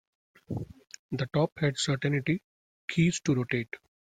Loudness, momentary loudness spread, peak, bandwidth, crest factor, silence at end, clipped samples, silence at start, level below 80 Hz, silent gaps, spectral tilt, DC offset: -30 LUFS; 15 LU; -14 dBFS; 9.6 kHz; 18 dB; 0.4 s; under 0.1%; 0.5 s; -60 dBFS; 0.99-1.09 s, 1.52-1.56 s, 2.44-2.88 s; -5.5 dB/octave; under 0.1%